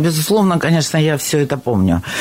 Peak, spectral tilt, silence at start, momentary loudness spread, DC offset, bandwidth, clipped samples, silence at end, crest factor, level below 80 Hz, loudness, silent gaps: -4 dBFS; -5 dB/octave; 0 s; 3 LU; under 0.1%; 16.5 kHz; under 0.1%; 0 s; 10 dB; -42 dBFS; -15 LUFS; none